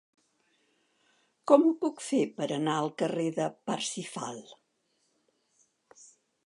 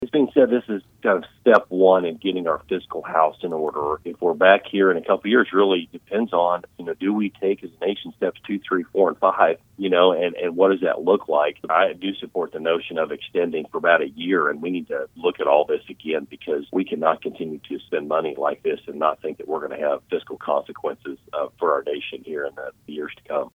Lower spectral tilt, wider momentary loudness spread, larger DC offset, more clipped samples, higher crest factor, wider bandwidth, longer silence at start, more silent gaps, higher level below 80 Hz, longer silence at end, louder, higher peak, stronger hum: second, -5 dB/octave vs -7 dB/octave; first, 16 LU vs 12 LU; neither; neither; first, 26 dB vs 20 dB; first, 11.5 kHz vs 4.7 kHz; first, 1.45 s vs 0 s; neither; second, -84 dBFS vs -64 dBFS; first, 1.95 s vs 0.05 s; second, -29 LUFS vs -22 LUFS; second, -6 dBFS vs 0 dBFS; neither